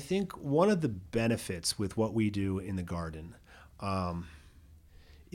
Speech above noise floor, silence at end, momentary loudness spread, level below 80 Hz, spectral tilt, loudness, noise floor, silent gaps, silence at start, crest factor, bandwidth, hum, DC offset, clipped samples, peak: 25 dB; 0.1 s; 14 LU; -54 dBFS; -5.5 dB/octave; -32 LUFS; -56 dBFS; none; 0 s; 20 dB; 16.5 kHz; none; under 0.1%; under 0.1%; -14 dBFS